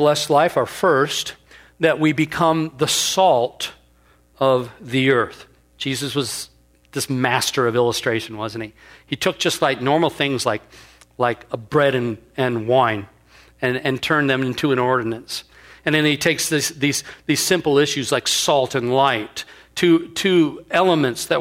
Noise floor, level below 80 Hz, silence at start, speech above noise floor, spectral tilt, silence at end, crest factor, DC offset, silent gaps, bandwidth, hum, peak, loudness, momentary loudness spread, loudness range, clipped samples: -55 dBFS; -56 dBFS; 0 s; 36 dB; -4 dB/octave; 0 s; 18 dB; under 0.1%; none; 16 kHz; none; -2 dBFS; -19 LUFS; 11 LU; 4 LU; under 0.1%